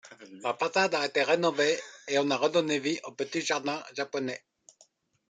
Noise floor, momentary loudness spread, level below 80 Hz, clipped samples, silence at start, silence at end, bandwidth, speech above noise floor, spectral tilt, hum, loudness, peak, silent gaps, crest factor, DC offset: -65 dBFS; 9 LU; -80 dBFS; under 0.1%; 0.05 s; 0.95 s; 9.4 kHz; 36 dB; -3.5 dB/octave; none; -29 LUFS; -12 dBFS; none; 18 dB; under 0.1%